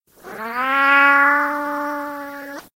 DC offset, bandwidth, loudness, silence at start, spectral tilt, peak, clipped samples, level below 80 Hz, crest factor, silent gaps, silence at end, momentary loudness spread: under 0.1%; 16 kHz; -16 LUFS; 0.25 s; -2.5 dB/octave; -4 dBFS; under 0.1%; -66 dBFS; 16 dB; none; 0.15 s; 20 LU